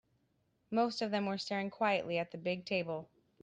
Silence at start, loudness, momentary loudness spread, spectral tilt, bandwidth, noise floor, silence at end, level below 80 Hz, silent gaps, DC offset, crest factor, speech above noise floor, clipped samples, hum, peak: 0.7 s; -36 LUFS; 5 LU; -5.5 dB/octave; 9.4 kHz; -77 dBFS; 0.35 s; -78 dBFS; none; under 0.1%; 18 dB; 41 dB; under 0.1%; none; -20 dBFS